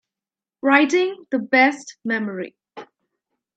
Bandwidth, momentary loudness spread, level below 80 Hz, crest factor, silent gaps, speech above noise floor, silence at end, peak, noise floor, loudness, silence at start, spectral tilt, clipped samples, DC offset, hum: 9 kHz; 15 LU; -76 dBFS; 22 dB; none; over 71 dB; 0.75 s; 0 dBFS; under -90 dBFS; -19 LUFS; 0.65 s; -4 dB/octave; under 0.1%; under 0.1%; none